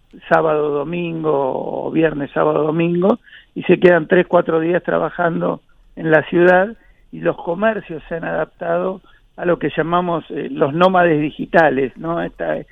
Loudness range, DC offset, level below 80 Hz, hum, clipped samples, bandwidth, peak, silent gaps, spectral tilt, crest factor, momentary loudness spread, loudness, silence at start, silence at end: 5 LU; under 0.1%; -50 dBFS; none; under 0.1%; 5.2 kHz; 0 dBFS; none; -9 dB/octave; 18 dB; 11 LU; -17 LUFS; 0.15 s; 0.1 s